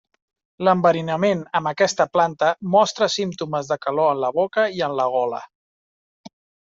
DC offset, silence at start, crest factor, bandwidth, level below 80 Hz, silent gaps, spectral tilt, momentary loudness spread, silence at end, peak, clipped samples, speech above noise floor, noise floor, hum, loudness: under 0.1%; 0.6 s; 18 dB; 7.8 kHz; -66 dBFS; 5.55-6.24 s; -4.5 dB/octave; 7 LU; 0.4 s; -4 dBFS; under 0.1%; over 70 dB; under -90 dBFS; none; -20 LUFS